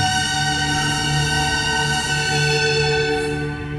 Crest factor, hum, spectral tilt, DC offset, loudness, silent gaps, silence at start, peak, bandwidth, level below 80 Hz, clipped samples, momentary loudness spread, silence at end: 12 dB; none; -3 dB/octave; under 0.1%; -18 LUFS; none; 0 s; -6 dBFS; 13 kHz; -36 dBFS; under 0.1%; 3 LU; 0 s